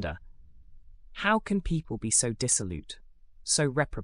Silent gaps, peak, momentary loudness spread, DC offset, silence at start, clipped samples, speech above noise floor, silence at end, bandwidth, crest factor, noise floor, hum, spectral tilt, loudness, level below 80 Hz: none; -10 dBFS; 20 LU; under 0.1%; 0 s; under 0.1%; 20 dB; 0 s; 12.5 kHz; 20 dB; -49 dBFS; none; -3.5 dB/octave; -27 LUFS; -44 dBFS